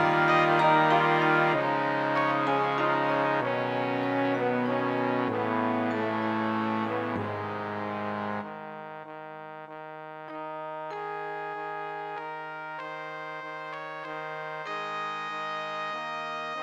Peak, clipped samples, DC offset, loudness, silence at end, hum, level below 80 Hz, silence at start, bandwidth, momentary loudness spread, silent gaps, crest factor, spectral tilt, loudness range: -8 dBFS; under 0.1%; under 0.1%; -28 LUFS; 0 s; none; -78 dBFS; 0 s; 16.5 kHz; 17 LU; none; 20 dB; -6.5 dB/octave; 12 LU